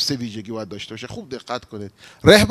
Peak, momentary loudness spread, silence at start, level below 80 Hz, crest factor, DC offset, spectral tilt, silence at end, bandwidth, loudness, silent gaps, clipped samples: 0 dBFS; 22 LU; 0 s; -44 dBFS; 20 dB; under 0.1%; -4.5 dB/octave; 0 s; 14 kHz; -21 LUFS; none; under 0.1%